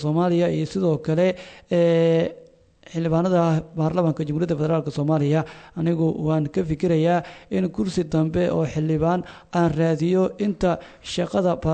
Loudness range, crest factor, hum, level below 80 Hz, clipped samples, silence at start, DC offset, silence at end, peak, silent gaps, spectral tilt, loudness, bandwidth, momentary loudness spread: 1 LU; 14 dB; none; -48 dBFS; under 0.1%; 0 s; under 0.1%; 0 s; -8 dBFS; none; -8 dB/octave; -22 LUFS; 8.8 kHz; 7 LU